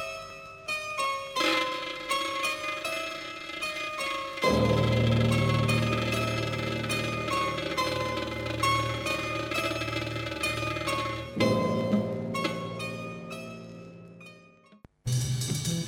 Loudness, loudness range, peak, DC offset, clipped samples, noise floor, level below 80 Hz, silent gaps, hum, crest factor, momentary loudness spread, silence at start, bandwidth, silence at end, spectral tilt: -29 LUFS; 6 LU; -12 dBFS; under 0.1%; under 0.1%; -56 dBFS; -48 dBFS; none; none; 18 dB; 14 LU; 0 s; 16.5 kHz; 0 s; -5 dB/octave